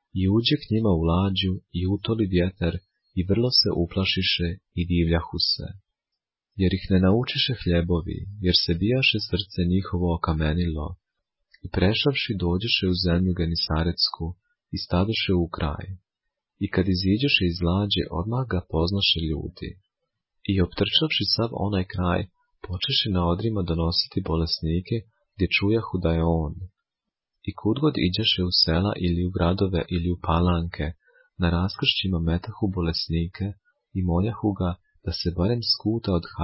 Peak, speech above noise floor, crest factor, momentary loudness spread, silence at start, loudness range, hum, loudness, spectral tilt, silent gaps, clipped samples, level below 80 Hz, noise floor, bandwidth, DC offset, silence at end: -6 dBFS; 63 dB; 18 dB; 12 LU; 0.15 s; 3 LU; none; -24 LUFS; -9 dB/octave; none; under 0.1%; -36 dBFS; -87 dBFS; 5.8 kHz; under 0.1%; 0 s